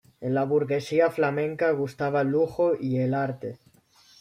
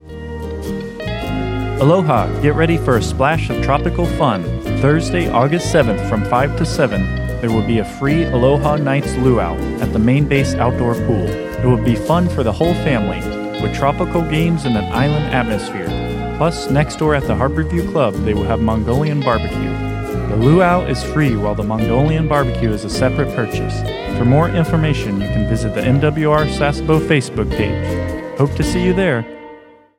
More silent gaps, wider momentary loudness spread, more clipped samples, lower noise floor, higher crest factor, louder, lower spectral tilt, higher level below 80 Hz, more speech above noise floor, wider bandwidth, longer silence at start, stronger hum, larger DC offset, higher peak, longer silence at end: neither; about the same, 5 LU vs 7 LU; neither; first, -58 dBFS vs -41 dBFS; about the same, 16 dB vs 16 dB; second, -25 LUFS vs -16 LUFS; about the same, -7.5 dB/octave vs -7 dB/octave; second, -66 dBFS vs -28 dBFS; first, 33 dB vs 25 dB; second, 13.5 kHz vs 16.5 kHz; first, 0.2 s vs 0.05 s; neither; neither; second, -10 dBFS vs 0 dBFS; first, 0.65 s vs 0.4 s